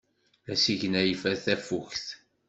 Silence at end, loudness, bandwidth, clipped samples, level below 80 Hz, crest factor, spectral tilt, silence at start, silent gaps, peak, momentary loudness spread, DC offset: 0.35 s; -28 LUFS; 8.2 kHz; under 0.1%; -64 dBFS; 20 dB; -4 dB/octave; 0.45 s; none; -10 dBFS; 11 LU; under 0.1%